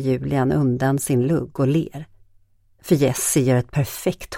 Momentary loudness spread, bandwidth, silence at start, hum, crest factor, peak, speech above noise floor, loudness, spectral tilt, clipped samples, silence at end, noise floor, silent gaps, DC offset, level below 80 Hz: 7 LU; 17 kHz; 0 s; none; 16 dB; -4 dBFS; 36 dB; -20 LUFS; -6 dB/octave; under 0.1%; 0 s; -56 dBFS; none; under 0.1%; -48 dBFS